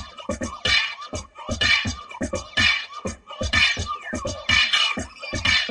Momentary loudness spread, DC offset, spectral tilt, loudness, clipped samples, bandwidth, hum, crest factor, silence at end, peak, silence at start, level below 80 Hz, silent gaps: 14 LU; under 0.1%; -2 dB/octave; -21 LUFS; under 0.1%; 11.5 kHz; none; 20 dB; 0 s; -4 dBFS; 0 s; -40 dBFS; none